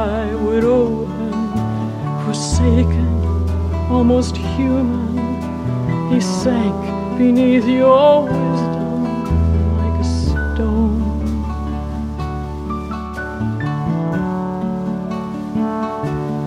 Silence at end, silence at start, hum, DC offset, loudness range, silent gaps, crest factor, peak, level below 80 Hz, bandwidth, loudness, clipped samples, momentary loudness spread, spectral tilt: 0 s; 0 s; none; under 0.1%; 7 LU; none; 16 dB; -2 dBFS; -26 dBFS; 11 kHz; -18 LUFS; under 0.1%; 10 LU; -7.5 dB/octave